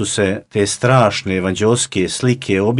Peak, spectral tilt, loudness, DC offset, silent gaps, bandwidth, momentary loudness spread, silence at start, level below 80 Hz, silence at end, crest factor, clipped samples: 0 dBFS; -4.5 dB/octave; -16 LUFS; under 0.1%; none; 11.5 kHz; 6 LU; 0 s; -50 dBFS; 0 s; 16 dB; under 0.1%